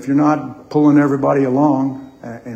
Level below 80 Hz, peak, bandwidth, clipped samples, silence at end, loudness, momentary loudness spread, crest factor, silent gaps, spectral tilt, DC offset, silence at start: -58 dBFS; 0 dBFS; 7.8 kHz; under 0.1%; 0 s; -15 LUFS; 18 LU; 14 dB; none; -9 dB/octave; under 0.1%; 0 s